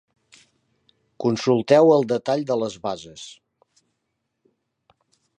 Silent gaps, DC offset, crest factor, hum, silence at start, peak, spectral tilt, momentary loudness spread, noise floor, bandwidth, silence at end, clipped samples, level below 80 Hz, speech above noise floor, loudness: none; under 0.1%; 22 dB; none; 1.2 s; -2 dBFS; -6 dB/octave; 22 LU; -77 dBFS; 10 kHz; 2.1 s; under 0.1%; -68 dBFS; 57 dB; -20 LUFS